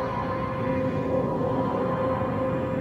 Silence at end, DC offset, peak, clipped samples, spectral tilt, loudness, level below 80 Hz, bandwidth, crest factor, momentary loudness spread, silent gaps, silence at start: 0 s; under 0.1%; -14 dBFS; under 0.1%; -9 dB/octave; -27 LUFS; -46 dBFS; 7.8 kHz; 12 dB; 2 LU; none; 0 s